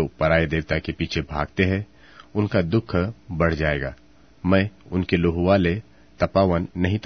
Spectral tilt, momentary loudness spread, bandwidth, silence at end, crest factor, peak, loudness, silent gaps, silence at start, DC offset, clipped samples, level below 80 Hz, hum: -8 dB/octave; 9 LU; 6.4 kHz; 0.05 s; 20 dB; -2 dBFS; -23 LUFS; none; 0 s; 0.2%; under 0.1%; -40 dBFS; none